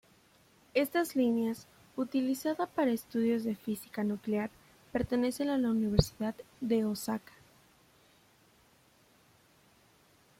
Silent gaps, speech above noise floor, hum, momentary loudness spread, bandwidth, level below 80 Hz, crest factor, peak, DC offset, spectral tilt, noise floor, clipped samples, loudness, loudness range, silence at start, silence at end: none; 34 dB; none; 9 LU; 16.5 kHz; -54 dBFS; 26 dB; -8 dBFS; under 0.1%; -6 dB/octave; -65 dBFS; under 0.1%; -33 LUFS; 7 LU; 0.75 s; 3.2 s